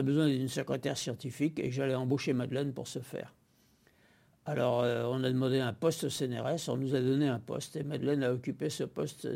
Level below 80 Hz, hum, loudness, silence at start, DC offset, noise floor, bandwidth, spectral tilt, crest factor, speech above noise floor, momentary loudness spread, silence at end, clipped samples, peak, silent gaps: -70 dBFS; none; -33 LUFS; 0 s; under 0.1%; -67 dBFS; 16.5 kHz; -6 dB/octave; 16 dB; 35 dB; 9 LU; 0 s; under 0.1%; -16 dBFS; none